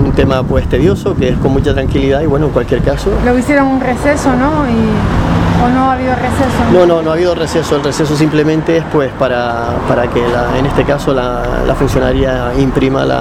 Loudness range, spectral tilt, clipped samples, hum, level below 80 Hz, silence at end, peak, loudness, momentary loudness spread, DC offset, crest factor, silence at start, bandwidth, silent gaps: 2 LU; -6.5 dB/octave; under 0.1%; none; -22 dBFS; 0 s; 0 dBFS; -12 LUFS; 3 LU; under 0.1%; 10 dB; 0 s; 15.5 kHz; none